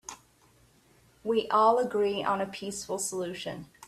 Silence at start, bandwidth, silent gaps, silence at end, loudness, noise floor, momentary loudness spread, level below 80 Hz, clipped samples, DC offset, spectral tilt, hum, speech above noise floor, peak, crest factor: 0.1 s; 14 kHz; none; 0 s; -29 LUFS; -62 dBFS; 15 LU; -66 dBFS; under 0.1%; under 0.1%; -3.5 dB/octave; none; 34 dB; -10 dBFS; 20 dB